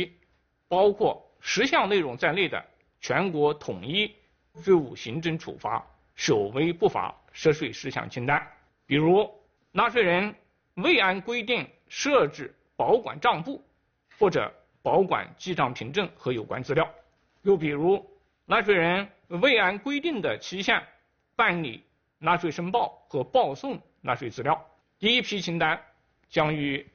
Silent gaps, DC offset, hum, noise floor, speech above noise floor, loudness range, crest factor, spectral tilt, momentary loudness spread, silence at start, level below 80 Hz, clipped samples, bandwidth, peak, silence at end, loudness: none; under 0.1%; none; -68 dBFS; 43 dB; 3 LU; 20 dB; -3 dB/octave; 11 LU; 0 s; -62 dBFS; under 0.1%; 6.8 kHz; -8 dBFS; 0.1 s; -26 LUFS